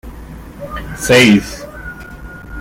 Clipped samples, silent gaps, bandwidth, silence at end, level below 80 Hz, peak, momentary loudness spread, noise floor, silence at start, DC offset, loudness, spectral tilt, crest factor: under 0.1%; none; 16.5 kHz; 0 s; -34 dBFS; 0 dBFS; 25 LU; -32 dBFS; 0.05 s; under 0.1%; -10 LUFS; -4.5 dB/octave; 16 dB